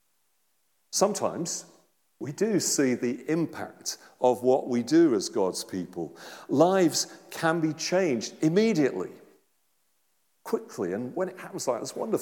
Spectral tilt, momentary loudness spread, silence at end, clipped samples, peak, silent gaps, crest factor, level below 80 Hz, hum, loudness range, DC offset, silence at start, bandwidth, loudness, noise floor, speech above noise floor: -4.5 dB/octave; 13 LU; 0 s; under 0.1%; -8 dBFS; none; 20 dB; -82 dBFS; none; 4 LU; under 0.1%; 0.9 s; 18 kHz; -27 LUFS; -74 dBFS; 47 dB